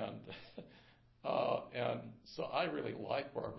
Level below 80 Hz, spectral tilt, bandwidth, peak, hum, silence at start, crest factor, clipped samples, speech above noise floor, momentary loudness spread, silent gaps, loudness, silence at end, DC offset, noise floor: -72 dBFS; -3.5 dB/octave; 5.8 kHz; -22 dBFS; none; 0 s; 18 dB; under 0.1%; 25 dB; 15 LU; none; -40 LUFS; 0 s; under 0.1%; -65 dBFS